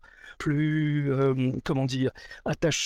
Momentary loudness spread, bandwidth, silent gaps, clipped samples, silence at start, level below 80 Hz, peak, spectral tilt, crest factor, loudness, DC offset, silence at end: 8 LU; 13 kHz; none; under 0.1%; 0.25 s; -52 dBFS; -12 dBFS; -5.5 dB/octave; 14 dB; -27 LUFS; under 0.1%; 0 s